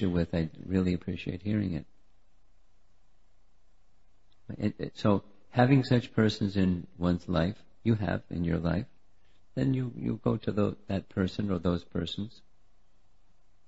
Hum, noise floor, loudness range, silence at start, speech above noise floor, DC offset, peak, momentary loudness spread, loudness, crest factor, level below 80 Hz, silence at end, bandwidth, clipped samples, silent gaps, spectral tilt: none; -68 dBFS; 10 LU; 0 s; 39 dB; 0.3%; -8 dBFS; 8 LU; -30 LUFS; 22 dB; -52 dBFS; 1.4 s; 8 kHz; under 0.1%; none; -8 dB/octave